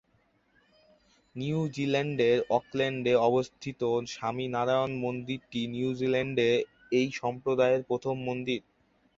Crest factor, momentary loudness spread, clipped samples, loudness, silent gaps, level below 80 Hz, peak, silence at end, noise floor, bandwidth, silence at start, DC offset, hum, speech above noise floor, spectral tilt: 18 dB; 9 LU; under 0.1%; -29 LUFS; none; -66 dBFS; -12 dBFS; 0.6 s; -69 dBFS; 7.8 kHz; 1.35 s; under 0.1%; none; 41 dB; -6 dB/octave